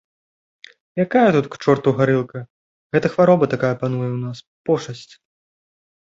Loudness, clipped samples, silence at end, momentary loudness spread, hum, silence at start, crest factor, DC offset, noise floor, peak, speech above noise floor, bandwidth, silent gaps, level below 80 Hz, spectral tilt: -19 LUFS; under 0.1%; 1.05 s; 16 LU; none; 0.95 s; 18 dB; under 0.1%; under -90 dBFS; -2 dBFS; over 72 dB; 7.8 kHz; 2.50-2.90 s, 4.47-4.65 s; -58 dBFS; -7.5 dB/octave